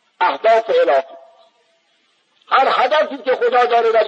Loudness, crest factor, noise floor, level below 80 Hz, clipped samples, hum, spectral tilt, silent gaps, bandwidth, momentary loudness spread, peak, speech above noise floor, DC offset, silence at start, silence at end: -15 LUFS; 14 dB; -61 dBFS; -86 dBFS; under 0.1%; none; -3 dB/octave; none; 8 kHz; 5 LU; -2 dBFS; 46 dB; under 0.1%; 0.2 s; 0 s